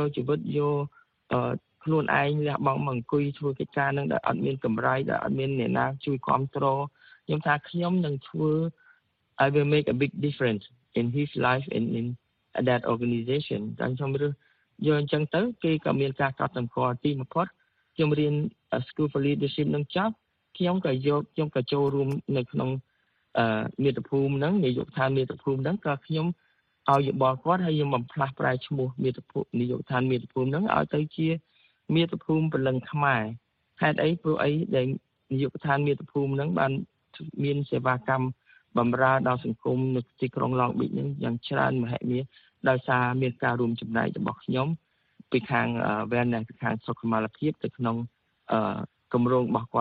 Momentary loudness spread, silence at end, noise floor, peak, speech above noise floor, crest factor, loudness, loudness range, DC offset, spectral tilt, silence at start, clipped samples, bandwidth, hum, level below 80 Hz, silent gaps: 7 LU; 0 s; -64 dBFS; -6 dBFS; 37 dB; 20 dB; -27 LUFS; 2 LU; under 0.1%; -9.5 dB/octave; 0 s; under 0.1%; 4.8 kHz; none; -62 dBFS; none